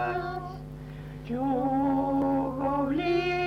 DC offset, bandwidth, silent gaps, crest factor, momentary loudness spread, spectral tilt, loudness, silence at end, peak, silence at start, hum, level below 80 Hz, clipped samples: under 0.1%; 6.6 kHz; none; 12 dB; 15 LU; -7.5 dB/octave; -28 LUFS; 0 s; -16 dBFS; 0 s; none; -48 dBFS; under 0.1%